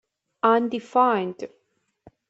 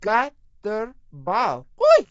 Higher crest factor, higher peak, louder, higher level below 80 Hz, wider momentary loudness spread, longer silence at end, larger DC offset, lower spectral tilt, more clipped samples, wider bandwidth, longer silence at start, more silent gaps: about the same, 20 dB vs 18 dB; about the same, -4 dBFS vs -4 dBFS; about the same, -22 LUFS vs -22 LUFS; second, -74 dBFS vs -54 dBFS; about the same, 16 LU vs 18 LU; first, 0.85 s vs 0.05 s; neither; first, -6.5 dB/octave vs -4.5 dB/octave; neither; about the same, 8 kHz vs 7.8 kHz; first, 0.45 s vs 0 s; neither